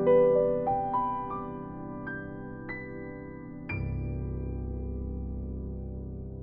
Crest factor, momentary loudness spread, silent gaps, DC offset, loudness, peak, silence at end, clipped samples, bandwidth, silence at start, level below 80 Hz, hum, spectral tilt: 18 dB; 15 LU; none; under 0.1%; -32 LUFS; -14 dBFS; 0 s; under 0.1%; 5 kHz; 0 s; -42 dBFS; none; -8.5 dB/octave